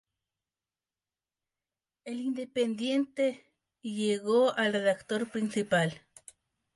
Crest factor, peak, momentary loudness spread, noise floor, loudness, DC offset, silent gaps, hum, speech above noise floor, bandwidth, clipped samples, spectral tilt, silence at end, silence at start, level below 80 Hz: 18 dB; -14 dBFS; 15 LU; under -90 dBFS; -30 LUFS; under 0.1%; none; none; over 61 dB; 11.5 kHz; under 0.1%; -5 dB/octave; 0.8 s; 2.05 s; -76 dBFS